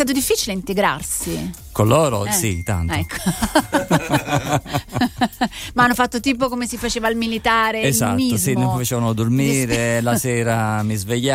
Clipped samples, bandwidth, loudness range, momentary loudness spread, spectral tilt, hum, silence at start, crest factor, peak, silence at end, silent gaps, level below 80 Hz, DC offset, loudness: under 0.1%; 16 kHz; 2 LU; 6 LU; -4.5 dB/octave; none; 0 s; 16 dB; -2 dBFS; 0 s; none; -38 dBFS; under 0.1%; -19 LUFS